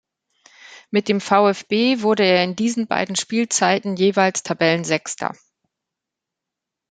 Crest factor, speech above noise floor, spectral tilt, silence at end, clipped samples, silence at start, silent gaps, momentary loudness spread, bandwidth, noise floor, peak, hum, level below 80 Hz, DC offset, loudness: 20 dB; 66 dB; -4 dB/octave; 1.6 s; under 0.1%; 0.65 s; none; 7 LU; 9.6 kHz; -84 dBFS; 0 dBFS; none; -66 dBFS; under 0.1%; -19 LUFS